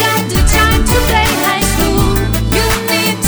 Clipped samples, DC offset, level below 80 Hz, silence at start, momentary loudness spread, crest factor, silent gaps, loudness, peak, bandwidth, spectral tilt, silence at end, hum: under 0.1%; under 0.1%; -16 dBFS; 0 s; 3 LU; 12 dB; none; -12 LUFS; 0 dBFS; over 20 kHz; -4 dB/octave; 0 s; none